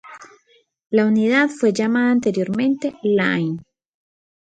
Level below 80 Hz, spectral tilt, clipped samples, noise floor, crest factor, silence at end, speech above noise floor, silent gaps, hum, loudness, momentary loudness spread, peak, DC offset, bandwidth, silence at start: -64 dBFS; -6 dB/octave; under 0.1%; -59 dBFS; 16 dB; 0.9 s; 41 dB; none; none; -19 LUFS; 6 LU; -4 dBFS; under 0.1%; 9.2 kHz; 0.05 s